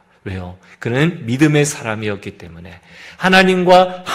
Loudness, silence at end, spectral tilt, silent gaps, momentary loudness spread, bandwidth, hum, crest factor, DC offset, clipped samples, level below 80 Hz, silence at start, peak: -14 LUFS; 0 s; -5 dB/octave; none; 19 LU; 15.5 kHz; none; 16 dB; under 0.1%; under 0.1%; -50 dBFS; 0.25 s; 0 dBFS